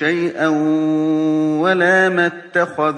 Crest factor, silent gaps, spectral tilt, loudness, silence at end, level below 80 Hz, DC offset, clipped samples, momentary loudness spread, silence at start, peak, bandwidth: 14 dB; none; -6 dB/octave; -16 LUFS; 0 s; -70 dBFS; under 0.1%; under 0.1%; 5 LU; 0 s; -2 dBFS; 9.4 kHz